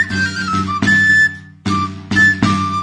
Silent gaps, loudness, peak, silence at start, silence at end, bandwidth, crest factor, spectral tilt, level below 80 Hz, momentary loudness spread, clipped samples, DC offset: none; -13 LUFS; 0 dBFS; 0 s; 0 s; 10.5 kHz; 14 dB; -4.5 dB/octave; -46 dBFS; 10 LU; under 0.1%; under 0.1%